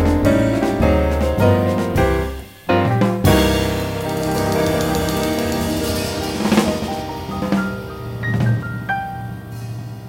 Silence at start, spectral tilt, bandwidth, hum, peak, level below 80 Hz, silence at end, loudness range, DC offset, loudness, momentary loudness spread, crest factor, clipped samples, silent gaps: 0 s; -6 dB/octave; 16.5 kHz; none; -2 dBFS; -30 dBFS; 0 s; 4 LU; under 0.1%; -19 LUFS; 12 LU; 16 dB; under 0.1%; none